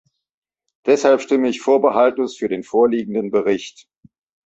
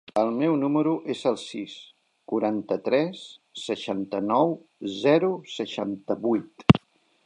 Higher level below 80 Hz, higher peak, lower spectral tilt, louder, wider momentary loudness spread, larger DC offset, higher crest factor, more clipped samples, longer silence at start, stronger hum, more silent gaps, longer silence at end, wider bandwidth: second, -64 dBFS vs -56 dBFS; about the same, -2 dBFS vs 0 dBFS; second, -5 dB/octave vs -7 dB/octave; first, -18 LUFS vs -25 LUFS; second, 9 LU vs 14 LU; neither; second, 16 dB vs 24 dB; neither; first, 0.85 s vs 0.15 s; neither; neither; first, 0.8 s vs 0.5 s; second, 8 kHz vs 10 kHz